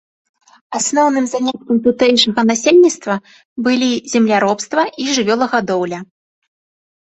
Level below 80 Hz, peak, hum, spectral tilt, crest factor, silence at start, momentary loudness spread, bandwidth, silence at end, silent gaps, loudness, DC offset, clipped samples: -60 dBFS; -2 dBFS; none; -3.5 dB/octave; 14 dB; 0.7 s; 11 LU; 8.2 kHz; 0.95 s; 3.45-3.56 s; -15 LUFS; under 0.1%; under 0.1%